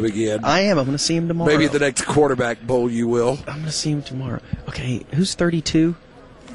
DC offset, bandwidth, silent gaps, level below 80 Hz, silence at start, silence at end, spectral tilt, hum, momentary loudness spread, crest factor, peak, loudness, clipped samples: under 0.1%; 11.5 kHz; none; -44 dBFS; 0 s; 0 s; -5 dB/octave; none; 11 LU; 16 dB; -4 dBFS; -20 LUFS; under 0.1%